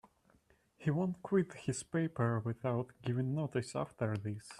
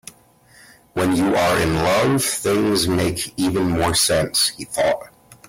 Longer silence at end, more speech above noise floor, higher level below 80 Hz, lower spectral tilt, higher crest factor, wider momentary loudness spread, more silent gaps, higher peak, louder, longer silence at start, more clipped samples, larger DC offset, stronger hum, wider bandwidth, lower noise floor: second, 0 s vs 0.15 s; about the same, 35 dB vs 33 dB; second, -70 dBFS vs -44 dBFS; first, -7 dB/octave vs -4 dB/octave; about the same, 18 dB vs 14 dB; about the same, 5 LU vs 5 LU; neither; second, -20 dBFS vs -6 dBFS; second, -37 LUFS vs -19 LUFS; second, 0.8 s vs 0.95 s; neither; neither; neither; second, 11.5 kHz vs 16.5 kHz; first, -71 dBFS vs -51 dBFS